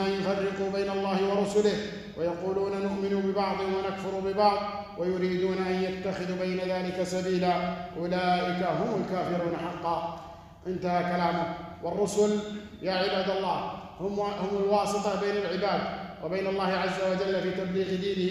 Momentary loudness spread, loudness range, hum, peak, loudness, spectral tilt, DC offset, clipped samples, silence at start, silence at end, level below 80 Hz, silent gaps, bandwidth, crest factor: 8 LU; 1 LU; none; -10 dBFS; -29 LUFS; -6 dB/octave; under 0.1%; under 0.1%; 0 s; 0 s; -58 dBFS; none; 12.5 kHz; 18 dB